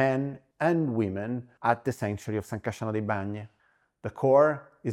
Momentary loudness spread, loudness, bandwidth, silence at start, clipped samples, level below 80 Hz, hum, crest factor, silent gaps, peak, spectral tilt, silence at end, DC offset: 14 LU; -28 LUFS; 15.5 kHz; 0 s; under 0.1%; -66 dBFS; none; 20 dB; none; -8 dBFS; -7.5 dB/octave; 0 s; under 0.1%